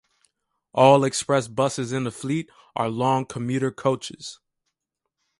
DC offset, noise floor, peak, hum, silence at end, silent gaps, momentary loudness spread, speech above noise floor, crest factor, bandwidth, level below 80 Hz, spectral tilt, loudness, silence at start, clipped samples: under 0.1%; -82 dBFS; -2 dBFS; none; 1.05 s; none; 15 LU; 60 dB; 22 dB; 11.5 kHz; -64 dBFS; -5.5 dB/octave; -23 LUFS; 0.75 s; under 0.1%